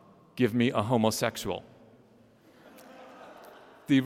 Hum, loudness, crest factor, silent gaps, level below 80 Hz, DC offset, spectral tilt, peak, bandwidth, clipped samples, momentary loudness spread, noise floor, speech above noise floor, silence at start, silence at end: none; -28 LUFS; 20 dB; none; -64 dBFS; under 0.1%; -5.5 dB/octave; -10 dBFS; 16.5 kHz; under 0.1%; 24 LU; -59 dBFS; 32 dB; 0.35 s; 0 s